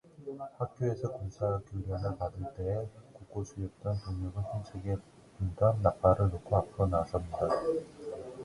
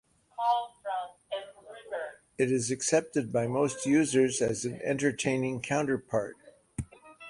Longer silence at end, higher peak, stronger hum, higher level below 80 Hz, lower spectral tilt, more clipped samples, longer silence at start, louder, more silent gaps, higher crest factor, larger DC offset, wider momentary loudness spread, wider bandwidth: about the same, 0 s vs 0 s; about the same, -10 dBFS vs -10 dBFS; neither; first, -48 dBFS vs -60 dBFS; first, -8.5 dB/octave vs -4.5 dB/octave; neither; second, 0.2 s vs 0.4 s; second, -34 LUFS vs -30 LUFS; neither; about the same, 22 dB vs 20 dB; neither; about the same, 14 LU vs 15 LU; about the same, 11 kHz vs 11.5 kHz